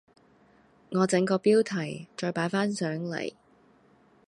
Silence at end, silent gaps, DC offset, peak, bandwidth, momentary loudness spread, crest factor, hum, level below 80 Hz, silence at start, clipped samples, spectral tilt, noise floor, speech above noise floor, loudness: 0.95 s; none; under 0.1%; -10 dBFS; 11.5 kHz; 11 LU; 18 dB; none; -72 dBFS; 0.9 s; under 0.1%; -5.5 dB/octave; -61 dBFS; 34 dB; -28 LUFS